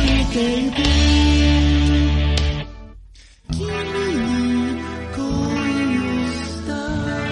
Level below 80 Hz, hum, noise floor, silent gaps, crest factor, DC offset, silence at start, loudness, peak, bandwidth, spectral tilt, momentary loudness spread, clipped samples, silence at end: -22 dBFS; none; -44 dBFS; none; 16 dB; under 0.1%; 0 s; -19 LUFS; -4 dBFS; 10.5 kHz; -5.5 dB/octave; 11 LU; under 0.1%; 0 s